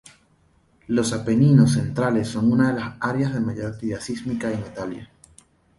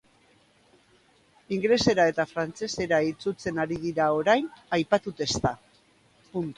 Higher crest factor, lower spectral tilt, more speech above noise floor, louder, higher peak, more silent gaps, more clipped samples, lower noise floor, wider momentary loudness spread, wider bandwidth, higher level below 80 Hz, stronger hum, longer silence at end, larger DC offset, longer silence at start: about the same, 20 dB vs 20 dB; first, -7 dB/octave vs -4.5 dB/octave; about the same, 39 dB vs 36 dB; first, -22 LUFS vs -26 LUFS; first, -2 dBFS vs -8 dBFS; neither; neither; about the same, -60 dBFS vs -62 dBFS; first, 13 LU vs 9 LU; about the same, 11.5 kHz vs 11.5 kHz; about the same, -52 dBFS vs -56 dBFS; neither; first, 0.75 s vs 0.05 s; neither; second, 0.9 s vs 1.5 s